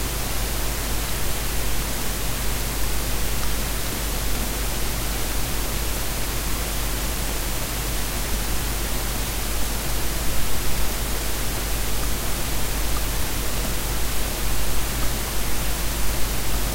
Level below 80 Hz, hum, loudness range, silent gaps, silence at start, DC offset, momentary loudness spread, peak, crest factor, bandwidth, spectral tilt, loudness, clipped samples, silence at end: -28 dBFS; none; 0 LU; none; 0 s; under 0.1%; 0 LU; -8 dBFS; 14 dB; 16 kHz; -3 dB/octave; -26 LUFS; under 0.1%; 0 s